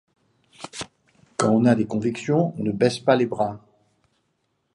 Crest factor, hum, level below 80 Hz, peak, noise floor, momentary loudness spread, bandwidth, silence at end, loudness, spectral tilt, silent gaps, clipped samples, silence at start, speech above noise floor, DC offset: 20 dB; none; -62 dBFS; -4 dBFS; -72 dBFS; 19 LU; 11 kHz; 1.15 s; -22 LUFS; -6 dB/octave; none; under 0.1%; 0.6 s; 51 dB; under 0.1%